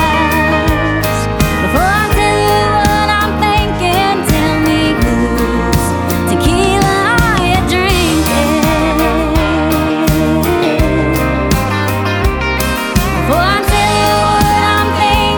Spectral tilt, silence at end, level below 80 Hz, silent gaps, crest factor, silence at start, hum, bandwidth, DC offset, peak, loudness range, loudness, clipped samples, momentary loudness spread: -5 dB/octave; 0 s; -22 dBFS; none; 12 dB; 0 s; none; over 20 kHz; under 0.1%; 0 dBFS; 2 LU; -12 LUFS; under 0.1%; 3 LU